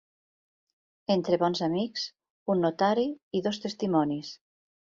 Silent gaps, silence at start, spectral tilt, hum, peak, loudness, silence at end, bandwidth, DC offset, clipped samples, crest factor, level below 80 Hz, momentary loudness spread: 2.30-2.46 s, 3.23-3.31 s; 1.1 s; -6 dB/octave; none; -12 dBFS; -28 LUFS; 0.6 s; 7.6 kHz; under 0.1%; under 0.1%; 18 dB; -70 dBFS; 12 LU